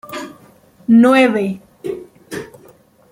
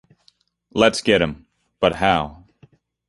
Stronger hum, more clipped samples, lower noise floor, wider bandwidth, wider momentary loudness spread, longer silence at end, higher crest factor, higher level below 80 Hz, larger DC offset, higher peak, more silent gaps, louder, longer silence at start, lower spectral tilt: neither; neither; second, -48 dBFS vs -61 dBFS; first, 16.5 kHz vs 11.5 kHz; first, 21 LU vs 13 LU; about the same, 0.65 s vs 0.75 s; about the same, 16 dB vs 20 dB; second, -60 dBFS vs -46 dBFS; neither; about the same, -2 dBFS vs -2 dBFS; neither; first, -12 LUFS vs -19 LUFS; second, 0.1 s vs 0.75 s; first, -6 dB/octave vs -4.5 dB/octave